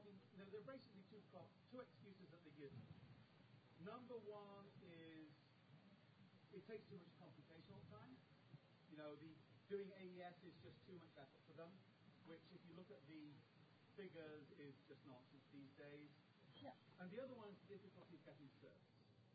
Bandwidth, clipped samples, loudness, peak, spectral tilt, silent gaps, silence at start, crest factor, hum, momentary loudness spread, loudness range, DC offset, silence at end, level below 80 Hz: 4.8 kHz; under 0.1%; -62 LUFS; -40 dBFS; -5.5 dB/octave; none; 0 s; 22 dB; none; 10 LU; 4 LU; under 0.1%; 0 s; under -90 dBFS